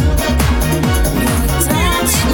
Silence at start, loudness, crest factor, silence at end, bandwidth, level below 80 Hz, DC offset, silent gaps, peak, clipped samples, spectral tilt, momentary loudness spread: 0 s; -14 LUFS; 12 dB; 0 s; 18.5 kHz; -18 dBFS; under 0.1%; none; -2 dBFS; under 0.1%; -4.5 dB/octave; 2 LU